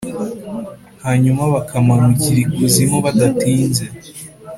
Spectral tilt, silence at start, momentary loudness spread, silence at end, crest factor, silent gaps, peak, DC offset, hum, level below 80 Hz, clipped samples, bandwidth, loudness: -6 dB/octave; 0 s; 17 LU; 0 s; 16 dB; none; 0 dBFS; under 0.1%; none; -46 dBFS; under 0.1%; 15.5 kHz; -15 LUFS